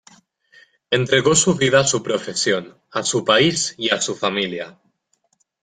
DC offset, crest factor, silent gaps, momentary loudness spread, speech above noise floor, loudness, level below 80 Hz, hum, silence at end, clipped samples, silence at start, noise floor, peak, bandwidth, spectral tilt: under 0.1%; 20 dB; none; 9 LU; 48 dB; -18 LUFS; -58 dBFS; none; 0.95 s; under 0.1%; 0.9 s; -67 dBFS; -2 dBFS; 9.8 kHz; -3 dB/octave